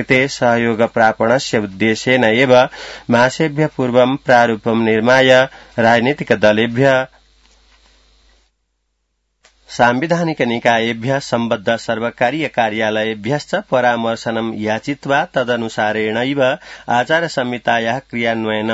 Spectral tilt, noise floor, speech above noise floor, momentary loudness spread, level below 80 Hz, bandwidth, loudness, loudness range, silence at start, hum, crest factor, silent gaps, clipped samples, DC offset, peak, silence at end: -5 dB/octave; -69 dBFS; 53 dB; 7 LU; -54 dBFS; 8 kHz; -15 LUFS; 6 LU; 0 s; none; 16 dB; none; under 0.1%; under 0.1%; 0 dBFS; 0 s